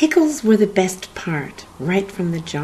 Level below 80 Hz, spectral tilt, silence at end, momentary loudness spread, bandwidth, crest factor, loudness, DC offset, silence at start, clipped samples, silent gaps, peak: -52 dBFS; -5.5 dB/octave; 0 s; 12 LU; 13 kHz; 18 dB; -19 LUFS; under 0.1%; 0 s; under 0.1%; none; -2 dBFS